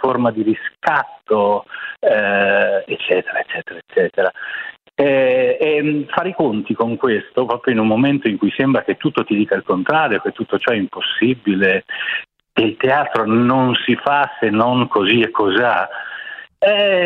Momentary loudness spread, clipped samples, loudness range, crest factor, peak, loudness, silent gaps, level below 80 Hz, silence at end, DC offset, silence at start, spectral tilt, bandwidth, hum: 8 LU; under 0.1%; 2 LU; 16 dB; 0 dBFS; -17 LUFS; none; -60 dBFS; 0 s; under 0.1%; 0 s; -8 dB/octave; 6 kHz; none